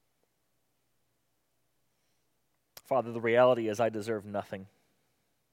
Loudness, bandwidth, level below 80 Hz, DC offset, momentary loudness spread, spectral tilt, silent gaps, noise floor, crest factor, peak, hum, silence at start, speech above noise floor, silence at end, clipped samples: -29 LUFS; 16 kHz; -84 dBFS; under 0.1%; 14 LU; -6 dB/octave; none; -79 dBFS; 22 dB; -12 dBFS; none; 2.9 s; 50 dB; 0.9 s; under 0.1%